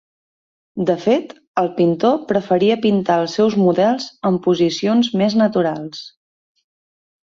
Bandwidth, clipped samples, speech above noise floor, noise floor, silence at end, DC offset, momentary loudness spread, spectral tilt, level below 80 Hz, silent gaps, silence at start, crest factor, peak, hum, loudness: 7.6 kHz; under 0.1%; over 74 dB; under -90 dBFS; 1.15 s; under 0.1%; 7 LU; -6.5 dB/octave; -60 dBFS; 1.47-1.54 s; 0.75 s; 14 dB; -4 dBFS; none; -17 LUFS